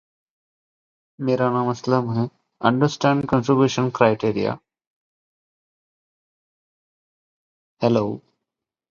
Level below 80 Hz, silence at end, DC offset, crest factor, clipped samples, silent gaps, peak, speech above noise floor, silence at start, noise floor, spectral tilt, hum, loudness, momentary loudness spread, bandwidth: -58 dBFS; 0.7 s; under 0.1%; 24 dB; under 0.1%; 4.87-7.77 s; 0 dBFS; 65 dB; 1.2 s; -85 dBFS; -7 dB/octave; none; -21 LUFS; 10 LU; 7.4 kHz